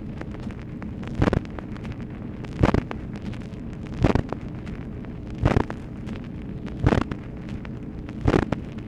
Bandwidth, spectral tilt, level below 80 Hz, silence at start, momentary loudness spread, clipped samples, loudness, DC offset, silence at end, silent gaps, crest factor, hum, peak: 10 kHz; -8 dB/octave; -36 dBFS; 0 s; 12 LU; under 0.1%; -28 LUFS; under 0.1%; 0 s; none; 26 dB; none; -2 dBFS